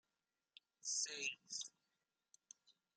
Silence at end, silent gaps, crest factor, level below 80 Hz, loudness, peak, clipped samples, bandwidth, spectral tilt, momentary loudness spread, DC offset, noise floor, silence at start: 0.25 s; none; 22 dB; under -90 dBFS; -44 LUFS; -30 dBFS; under 0.1%; 13 kHz; 2.5 dB/octave; 23 LU; under 0.1%; under -90 dBFS; 0.85 s